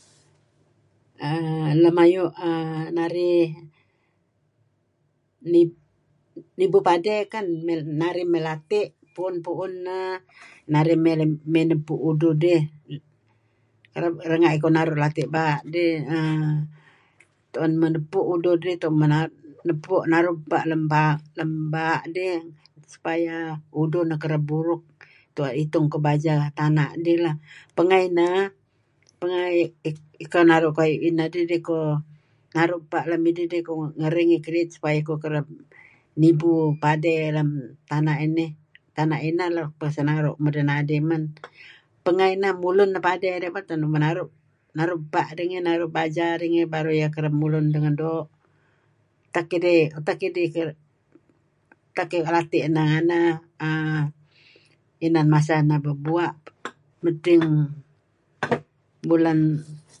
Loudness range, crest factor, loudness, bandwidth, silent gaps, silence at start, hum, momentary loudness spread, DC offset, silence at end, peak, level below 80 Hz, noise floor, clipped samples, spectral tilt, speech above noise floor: 3 LU; 20 dB; -23 LUFS; 9.6 kHz; none; 1.2 s; none; 12 LU; under 0.1%; 0.2 s; -4 dBFS; -70 dBFS; -69 dBFS; under 0.1%; -8 dB/octave; 47 dB